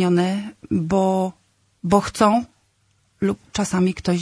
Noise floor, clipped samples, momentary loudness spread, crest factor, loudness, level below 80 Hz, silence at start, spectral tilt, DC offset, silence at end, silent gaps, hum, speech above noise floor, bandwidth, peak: -64 dBFS; under 0.1%; 10 LU; 18 dB; -21 LUFS; -48 dBFS; 0 s; -6 dB/octave; under 0.1%; 0 s; none; none; 44 dB; 11 kHz; -2 dBFS